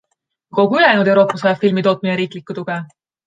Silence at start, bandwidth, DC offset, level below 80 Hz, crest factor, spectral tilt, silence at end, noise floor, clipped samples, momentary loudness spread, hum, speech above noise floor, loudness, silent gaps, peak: 0.55 s; 9.2 kHz; under 0.1%; -66 dBFS; 16 dB; -7 dB/octave; 0.4 s; -68 dBFS; under 0.1%; 13 LU; none; 53 dB; -15 LUFS; none; -2 dBFS